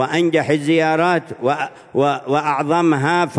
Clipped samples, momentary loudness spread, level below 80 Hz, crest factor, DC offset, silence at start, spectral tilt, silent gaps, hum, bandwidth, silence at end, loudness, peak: under 0.1%; 5 LU; -64 dBFS; 14 dB; under 0.1%; 0 s; -6 dB/octave; none; none; 10.5 kHz; 0 s; -17 LUFS; -2 dBFS